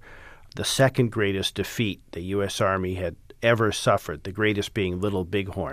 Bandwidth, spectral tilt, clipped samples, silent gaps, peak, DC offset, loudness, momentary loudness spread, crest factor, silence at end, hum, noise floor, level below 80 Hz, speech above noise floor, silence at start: 15.5 kHz; -5 dB/octave; under 0.1%; none; -6 dBFS; under 0.1%; -25 LUFS; 9 LU; 18 dB; 0 s; none; -46 dBFS; -50 dBFS; 21 dB; 0.05 s